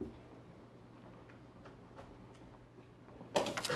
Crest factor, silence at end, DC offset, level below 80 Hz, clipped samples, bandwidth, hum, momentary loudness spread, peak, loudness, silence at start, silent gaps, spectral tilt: 28 dB; 0 s; under 0.1%; -68 dBFS; under 0.1%; 13 kHz; none; 20 LU; -18 dBFS; -43 LUFS; 0 s; none; -3.5 dB/octave